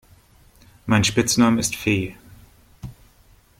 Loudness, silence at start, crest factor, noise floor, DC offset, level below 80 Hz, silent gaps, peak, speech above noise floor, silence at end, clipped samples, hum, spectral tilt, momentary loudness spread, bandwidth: -20 LUFS; 0.85 s; 20 dB; -54 dBFS; under 0.1%; -48 dBFS; none; -4 dBFS; 35 dB; 0.7 s; under 0.1%; none; -4 dB/octave; 23 LU; 16.5 kHz